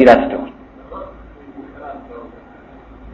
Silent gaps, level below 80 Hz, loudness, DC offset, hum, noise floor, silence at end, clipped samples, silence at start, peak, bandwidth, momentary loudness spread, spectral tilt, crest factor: none; -42 dBFS; -14 LUFS; under 0.1%; none; -41 dBFS; 0.9 s; 0.2%; 0 s; 0 dBFS; 8.2 kHz; 24 LU; -6.5 dB/octave; 18 dB